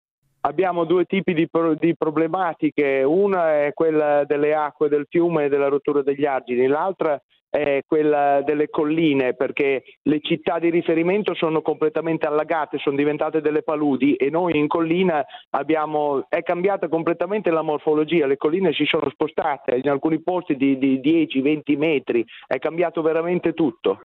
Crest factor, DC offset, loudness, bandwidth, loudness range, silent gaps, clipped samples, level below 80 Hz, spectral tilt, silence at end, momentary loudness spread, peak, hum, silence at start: 16 dB; under 0.1%; -21 LUFS; 4.3 kHz; 2 LU; 1.96-2.00 s, 7.23-7.29 s, 7.41-7.47 s, 9.97-10.05 s, 15.47-15.51 s, 19.15-19.19 s; under 0.1%; -64 dBFS; -9.5 dB/octave; 0.05 s; 4 LU; -4 dBFS; none; 0.45 s